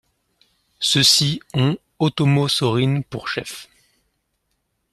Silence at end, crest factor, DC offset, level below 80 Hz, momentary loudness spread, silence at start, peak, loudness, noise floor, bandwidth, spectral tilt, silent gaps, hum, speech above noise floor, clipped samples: 1.3 s; 20 dB; under 0.1%; -56 dBFS; 13 LU; 0.8 s; -2 dBFS; -18 LUFS; -72 dBFS; 13.5 kHz; -4 dB/octave; none; none; 53 dB; under 0.1%